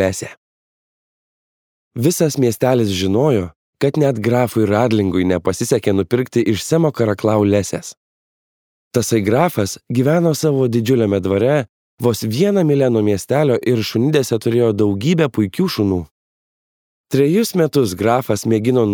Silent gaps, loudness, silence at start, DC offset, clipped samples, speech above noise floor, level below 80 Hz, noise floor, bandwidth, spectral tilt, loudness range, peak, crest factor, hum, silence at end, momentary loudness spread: 0.37-1.91 s, 3.56-3.73 s, 7.97-8.91 s, 11.69-11.98 s, 16.11-17.04 s; -16 LUFS; 0 s; under 0.1%; under 0.1%; over 74 dB; -52 dBFS; under -90 dBFS; over 20 kHz; -6 dB/octave; 2 LU; 0 dBFS; 16 dB; none; 0 s; 5 LU